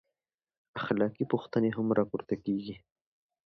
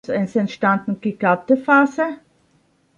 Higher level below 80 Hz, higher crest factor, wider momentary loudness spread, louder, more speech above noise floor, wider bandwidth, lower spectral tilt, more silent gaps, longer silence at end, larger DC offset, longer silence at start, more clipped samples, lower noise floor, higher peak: about the same, -68 dBFS vs -64 dBFS; about the same, 20 dB vs 18 dB; first, 14 LU vs 10 LU; second, -31 LUFS vs -19 LUFS; first, over 59 dB vs 42 dB; second, 6 kHz vs 7.4 kHz; first, -9 dB/octave vs -7.5 dB/octave; neither; about the same, 0.75 s vs 0.85 s; neither; first, 0.75 s vs 0.1 s; neither; first, under -90 dBFS vs -60 dBFS; second, -14 dBFS vs -2 dBFS